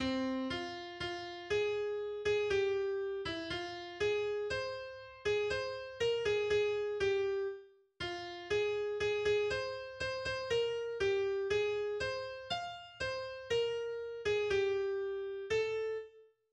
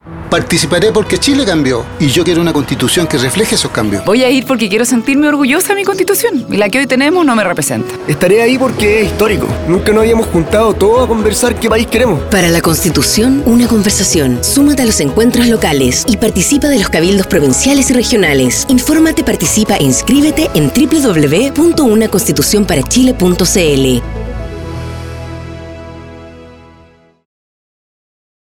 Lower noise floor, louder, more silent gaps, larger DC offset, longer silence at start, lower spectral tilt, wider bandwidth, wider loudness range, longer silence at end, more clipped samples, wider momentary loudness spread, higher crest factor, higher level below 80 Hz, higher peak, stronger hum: first, -58 dBFS vs -44 dBFS; second, -36 LUFS vs -10 LUFS; neither; neither; about the same, 0 s vs 0.05 s; about the same, -4 dB/octave vs -4 dB/octave; second, 9.4 kHz vs 19 kHz; about the same, 2 LU vs 3 LU; second, 0.3 s vs 2 s; neither; first, 9 LU vs 6 LU; about the same, 14 dB vs 10 dB; second, -62 dBFS vs -28 dBFS; second, -22 dBFS vs 0 dBFS; neither